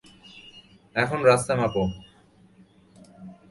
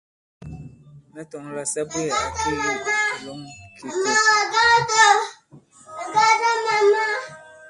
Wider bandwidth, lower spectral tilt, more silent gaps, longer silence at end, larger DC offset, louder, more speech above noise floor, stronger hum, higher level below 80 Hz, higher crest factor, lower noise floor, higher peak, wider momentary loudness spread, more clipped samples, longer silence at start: about the same, 11.5 kHz vs 11.5 kHz; first, -5 dB/octave vs -1.5 dB/octave; neither; first, 0.2 s vs 0 s; neither; second, -23 LUFS vs -19 LUFS; first, 34 dB vs 30 dB; neither; about the same, -52 dBFS vs -52 dBFS; about the same, 22 dB vs 18 dB; first, -56 dBFS vs -50 dBFS; about the same, -6 dBFS vs -4 dBFS; first, 26 LU vs 22 LU; neither; about the same, 0.35 s vs 0.4 s